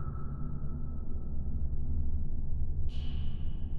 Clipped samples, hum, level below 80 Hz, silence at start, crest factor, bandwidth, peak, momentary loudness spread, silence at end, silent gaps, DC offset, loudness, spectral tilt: under 0.1%; none; -34 dBFS; 0 s; 10 dB; 3.5 kHz; -18 dBFS; 4 LU; 0 s; none; under 0.1%; -39 LUFS; -9.5 dB/octave